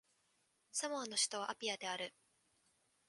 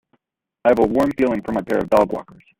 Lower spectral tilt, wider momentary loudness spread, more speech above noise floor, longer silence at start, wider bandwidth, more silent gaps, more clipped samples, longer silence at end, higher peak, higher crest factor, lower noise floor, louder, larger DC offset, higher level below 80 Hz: second, 0 dB/octave vs -7.5 dB/octave; about the same, 8 LU vs 6 LU; second, 38 dB vs 51 dB; about the same, 0.75 s vs 0.65 s; second, 11.5 kHz vs 16.5 kHz; neither; neither; first, 1 s vs 0.35 s; second, -22 dBFS vs -2 dBFS; first, 22 dB vs 16 dB; first, -79 dBFS vs -69 dBFS; second, -40 LUFS vs -19 LUFS; neither; second, under -90 dBFS vs -48 dBFS